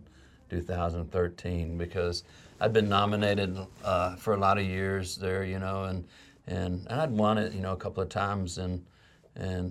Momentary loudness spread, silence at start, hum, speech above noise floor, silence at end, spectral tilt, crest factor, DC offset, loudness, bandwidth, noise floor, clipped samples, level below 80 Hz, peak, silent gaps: 12 LU; 0 s; none; 26 dB; 0 s; -6 dB/octave; 20 dB; under 0.1%; -31 LUFS; 14 kHz; -55 dBFS; under 0.1%; -54 dBFS; -10 dBFS; none